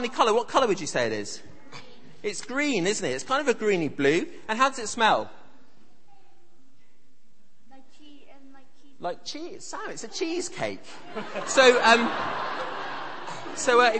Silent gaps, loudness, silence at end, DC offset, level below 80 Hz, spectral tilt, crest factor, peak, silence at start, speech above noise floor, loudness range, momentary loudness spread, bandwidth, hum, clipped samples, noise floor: none; -25 LUFS; 0 s; 1%; -66 dBFS; -3 dB/octave; 22 dB; -4 dBFS; 0 s; 41 dB; 15 LU; 18 LU; 8.8 kHz; none; under 0.1%; -66 dBFS